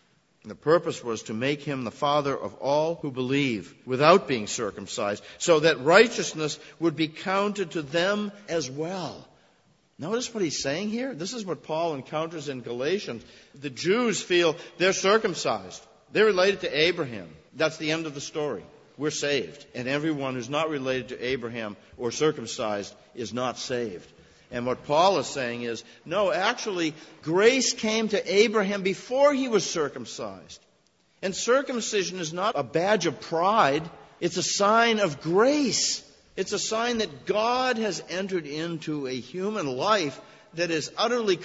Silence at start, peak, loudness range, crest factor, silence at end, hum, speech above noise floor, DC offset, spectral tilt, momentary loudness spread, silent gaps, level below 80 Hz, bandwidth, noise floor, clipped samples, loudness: 0.45 s; -2 dBFS; 7 LU; 24 dB; 0 s; none; 39 dB; under 0.1%; -3.5 dB/octave; 13 LU; none; -64 dBFS; 8 kHz; -65 dBFS; under 0.1%; -26 LUFS